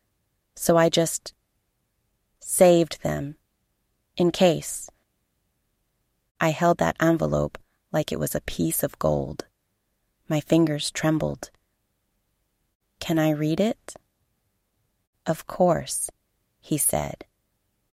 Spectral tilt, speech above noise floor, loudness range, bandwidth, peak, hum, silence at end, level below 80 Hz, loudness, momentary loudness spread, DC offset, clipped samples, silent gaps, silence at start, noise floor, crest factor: -5 dB/octave; 52 dB; 5 LU; 16.5 kHz; -4 dBFS; none; 0.8 s; -50 dBFS; -24 LUFS; 16 LU; under 0.1%; under 0.1%; 6.31-6.35 s, 12.75-12.80 s, 15.07-15.13 s; 0.55 s; -75 dBFS; 22 dB